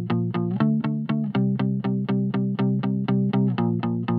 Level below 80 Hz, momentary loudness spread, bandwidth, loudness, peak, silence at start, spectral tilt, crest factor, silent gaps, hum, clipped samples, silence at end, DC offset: -70 dBFS; 3 LU; 4.9 kHz; -24 LUFS; -8 dBFS; 0 s; -11 dB/octave; 14 dB; none; none; under 0.1%; 0 s; under 0.1%